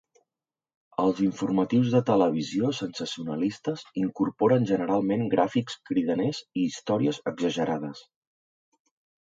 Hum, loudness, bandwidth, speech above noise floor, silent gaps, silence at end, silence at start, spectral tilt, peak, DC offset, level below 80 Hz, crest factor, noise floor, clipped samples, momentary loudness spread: none; -26 LUFS; 7.8 kHz; over 64 dB; none; 1.2 s; 1 s; -6.5 dB/octave; -8 dBFS; under 0.1%; -66 dBFS; 18 dB; under -90 dBFS; under 0.1%; 9 LU